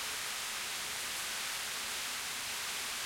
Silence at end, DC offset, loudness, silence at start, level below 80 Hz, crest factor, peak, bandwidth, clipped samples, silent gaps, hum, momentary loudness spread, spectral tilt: 0 s; under 0.1%; -36 LUFS; 0 s; -68 dBFS; 12 dB; -26 dBFS; 16.5 kHz; under 0.1%; none; none; 1 LU; 1 dB/octave